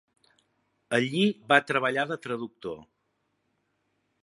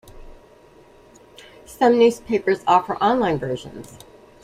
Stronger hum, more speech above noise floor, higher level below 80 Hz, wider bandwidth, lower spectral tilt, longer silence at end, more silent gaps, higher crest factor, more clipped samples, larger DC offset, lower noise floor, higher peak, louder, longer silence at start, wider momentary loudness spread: first, 50 Hz at -70 dBFS vs none; first, 49 dB vs 30 dB; second, -74 dBFS vs -50 dBFS; second, 11.5 kHz vs 15 kHz; about the same, -5 dB/octave vs -5.5 dB/octave; first, 1.4 s vs 0.6 s; neither; first, 26 dB vs 20 dB; neither; neither; first, -76 dBFS vs -50 dBFS; about the same, -4 dBFS vs -2 dBFS; second, -26 LUFS vs -19 LUFS; first, 0.9 s vs 0.15 s; second, 17 LU vs 20 LU